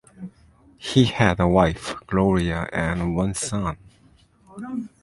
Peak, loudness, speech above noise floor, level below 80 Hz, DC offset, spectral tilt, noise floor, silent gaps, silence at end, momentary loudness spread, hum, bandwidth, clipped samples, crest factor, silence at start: -2 dBFS; -22 LUFS; 34 dB; -40 dBFS; under 0.1%; -5.5 dB/octave; -56 dBFS; none; 0.15 s; 20 LU; none; 11.5 kHz; under 0.1%; 22 dB; 0.2 s